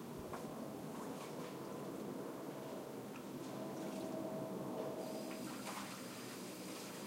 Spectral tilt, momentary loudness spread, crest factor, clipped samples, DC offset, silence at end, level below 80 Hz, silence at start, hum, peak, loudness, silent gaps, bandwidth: -5 dB/octave; 4 LU; 14 dB; under 0.1%; under 0.1%; 0 s; -78 dBFS; 0 s; none; -32 dBFS; -47 LUFS; none; 16 kHz